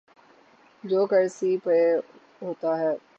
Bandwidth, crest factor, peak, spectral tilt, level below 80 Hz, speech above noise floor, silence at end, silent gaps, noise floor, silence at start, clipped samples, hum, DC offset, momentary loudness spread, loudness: 8.2 kHz; 14 dB; -12 dBFS; -6.5 dB/octave; -82 dBFS; 33 dB; 0.2 s; none; -57 dBFS; 0.85 s; under 0.1%; none; under 0.1%; 16 LU; -24 LUFS